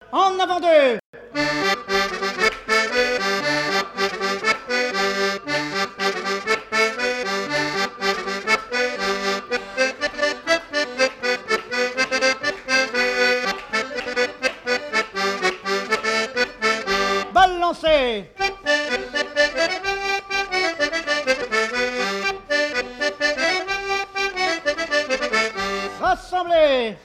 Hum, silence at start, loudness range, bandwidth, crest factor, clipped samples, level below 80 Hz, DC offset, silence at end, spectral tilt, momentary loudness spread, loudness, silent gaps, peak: none; 0 s; 2 LU; 15.5 kHz; 16 dB; under 0.1%; -50 dBFS; under 0.1%; 0.05 s; -2.5 dB/octave; 6 LU; -21 LUFS; 1.04-1.13 s; -6 dBFS